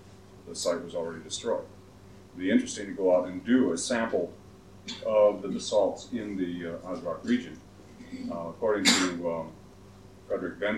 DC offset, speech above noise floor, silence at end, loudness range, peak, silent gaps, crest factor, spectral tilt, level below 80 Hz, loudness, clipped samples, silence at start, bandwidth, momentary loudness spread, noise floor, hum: under 0.1%; 23 dB; 0 s; 4 LU; -6 dBFS; none; 24 dB; -3.5 dB/octave; -62 dBFS; -29 LUFS; under 0.1%; 0 s; 14.5 kHz; 17 LU; -51 dBFS; none